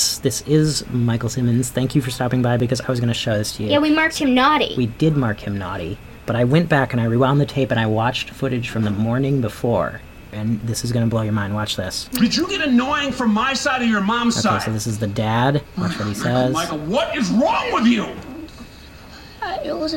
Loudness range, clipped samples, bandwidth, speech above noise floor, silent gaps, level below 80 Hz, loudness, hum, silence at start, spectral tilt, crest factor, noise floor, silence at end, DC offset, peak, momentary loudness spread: 3 LU; under 0.1%; 18.5 kHz; 21 dB; none; -42 dBFS; -19 LUFS; none; 0 s; -5 dB/octave; 16 dB; -40 dBFS; 0 s; under 0.1%; -4 dBFS; 10 LU